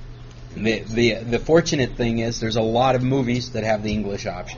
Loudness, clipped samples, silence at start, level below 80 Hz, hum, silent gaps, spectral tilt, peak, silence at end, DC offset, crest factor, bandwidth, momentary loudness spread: -21 LUFS; under 0.1%; 0 s; -38 dBFS; none; none; -5 dB/octave; -4 dBFS; 0 s; under 0.1%; 18 dB; 7.2 kHz; 9 LU